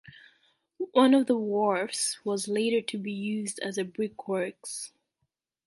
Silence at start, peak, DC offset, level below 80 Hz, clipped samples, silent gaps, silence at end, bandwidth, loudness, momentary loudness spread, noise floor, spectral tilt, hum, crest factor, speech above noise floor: 0.05 s; -8 dBFS; under 0.1%; -78 dBFS; under 0.1%; none; 0.8 s; 12 kHz; -28 LUFS; 14 LU; -81 dBFS; -4 dB/octave; none; 20 dB; 54 dB